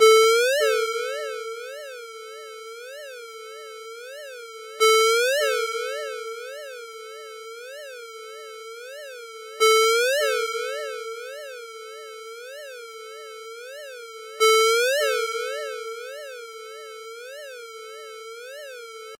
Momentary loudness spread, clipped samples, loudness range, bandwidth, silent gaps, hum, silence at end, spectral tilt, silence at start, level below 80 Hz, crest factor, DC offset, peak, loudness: 21 LU; under 0.1%; 13 LU; 16 kHz; none; none; 0.05 s; 4 dB/octave; 0 s; under -90 dBFS; 22 dB; under 0.1%; -4 dBFS; -22 LUFS